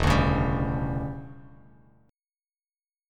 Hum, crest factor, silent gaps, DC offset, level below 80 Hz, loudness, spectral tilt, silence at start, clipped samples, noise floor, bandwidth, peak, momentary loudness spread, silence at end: none; 20 dB; none; under 0.1%; -36 dBFS; -27 LUFS; -7 dB/octave; 0 s; under 0.1%; under -90 dBFS; 14 kHz; -8 dBFS; 18 LU; 1.6 s